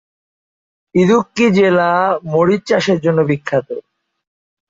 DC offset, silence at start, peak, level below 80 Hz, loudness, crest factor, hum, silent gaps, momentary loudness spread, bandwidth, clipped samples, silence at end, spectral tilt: under 0.1%; 0.95 s; -2 dBFS; -56 dBFS; -14 LUFS; 14 dB; none; none; 8 LU; 7.8 kHz; under 0.1%; 0.9 s; -6.5 dB/octave